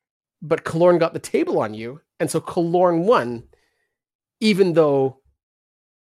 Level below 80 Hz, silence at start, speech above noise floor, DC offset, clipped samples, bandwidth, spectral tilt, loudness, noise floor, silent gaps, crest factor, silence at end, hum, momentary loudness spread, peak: -62 dBFS; 0.4 s; 54 dB; under 0.1%; under 0.1%; 15 kHz; -6 dB/octave; -20 LUFS; -72 dBFS; 4.15-4.19 s; 16 dB; 1 s; none; 13 LU; -4 dBFS